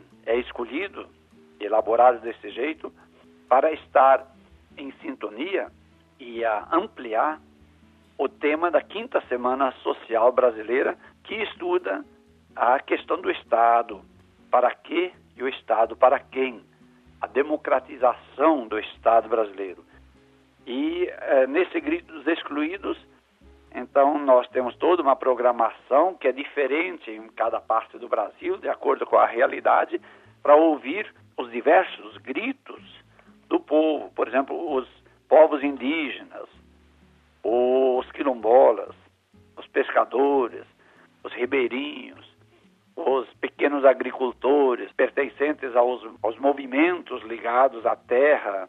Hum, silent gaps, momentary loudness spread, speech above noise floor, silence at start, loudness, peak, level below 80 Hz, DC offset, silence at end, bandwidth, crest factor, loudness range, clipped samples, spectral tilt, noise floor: none; none; 15 LU; 36 dB; 0.25 s; -23 LUFS; -4 dBFS; -64 dBFS; under 0.1%; 0 s; 4.1 kHz; 20 dB; 4 LU; under 0.1%; -6.5 dB/octave; -59 dBFS